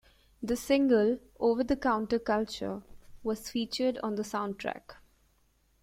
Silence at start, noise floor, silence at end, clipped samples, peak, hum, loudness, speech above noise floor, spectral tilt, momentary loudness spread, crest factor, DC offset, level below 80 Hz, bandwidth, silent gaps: 0.4 s; -69 dBFS; 0.9 s; under 0.1%; -12 dBFS; none; -30 LUFS; 39 dB; -5 dB/octave; 13 LU; 18 dB; under 0.1%; -56 dBFS; 16.5 kHz; none